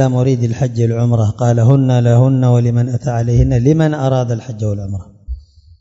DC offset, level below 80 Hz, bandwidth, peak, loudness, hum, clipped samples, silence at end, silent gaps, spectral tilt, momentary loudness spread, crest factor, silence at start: under 0.1%; -32 dBFS; 7.8 kHz; 0 dBFS; -14 LUFS; none; under 0.1%; 0.4 s; none; -8.5 dB/octave; 14 LU; 14 dB; 0 s